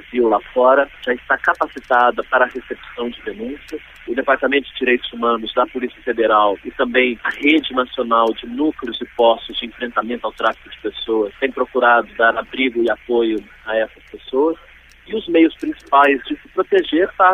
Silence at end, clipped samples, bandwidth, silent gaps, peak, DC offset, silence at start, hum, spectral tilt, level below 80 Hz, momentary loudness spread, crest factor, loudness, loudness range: 0 s; under 0.1%; 8.4 kHz; none; 0 dBFS; under 0.1%; 0.1 s; none; -5 dB/octave; -50 dBFS; 12 LU; 18 dB; -18 LUFS; 3 LU